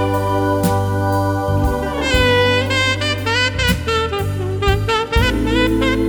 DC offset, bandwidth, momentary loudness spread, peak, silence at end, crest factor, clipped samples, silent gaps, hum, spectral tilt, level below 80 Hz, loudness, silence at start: under 0.1%; over 20 kHz; 5 LU; -2 dBFS; 0 s; 14 dB; under 0.1%; none; none; -5 dB/octave; -26 dBFS; -17 LUFS; 0 s